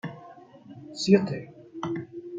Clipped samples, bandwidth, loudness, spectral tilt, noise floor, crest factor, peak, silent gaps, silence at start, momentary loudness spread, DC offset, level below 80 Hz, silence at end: under 0.1%; 9 kHz; -27 LUFS; -6 dB/octave; -49 dBFS; 24 dB; -6 dBFS; none; 0.05 s; 25 LU; under 0.1%; -70 dBFS; 0 s